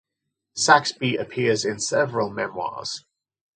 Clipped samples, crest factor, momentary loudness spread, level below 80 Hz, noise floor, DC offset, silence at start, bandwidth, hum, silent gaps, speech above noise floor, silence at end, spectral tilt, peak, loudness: under 0.1%; 24 dB; 14 LU; -66 dBFS; -82 dBFS; under 0.1%; 0.55 s; 9.6 kHz; none; none; 59 dB; 0.55 s; -3 dB/octave; 0 dBFS; -22 LUFS